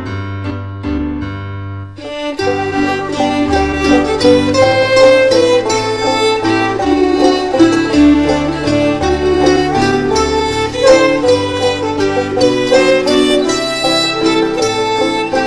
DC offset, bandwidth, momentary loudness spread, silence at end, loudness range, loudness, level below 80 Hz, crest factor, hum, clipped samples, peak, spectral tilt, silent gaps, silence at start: 0.5%; 11 kHz; 12 LU; 0 s; 5 LU; -12 LUFS; -32 dBFS; 12 dB; none; under 0.1%; 0 dBFS; -4.5 dB/octave; none; 0 s